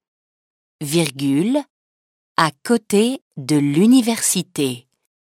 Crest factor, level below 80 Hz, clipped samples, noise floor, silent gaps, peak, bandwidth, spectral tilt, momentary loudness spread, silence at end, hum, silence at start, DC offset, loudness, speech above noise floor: 18 dB; -66 dBFS; under 0.1%; under -90 dBFS; 1.70-2.35 s, 3.22-3.31 s; 0 dBFS; 16.5 kHz; -4.5 dB/octave; 10 LU; 0.4 s; none; 0.8 s; under 0.1%; -18 LUFS; over 72 dB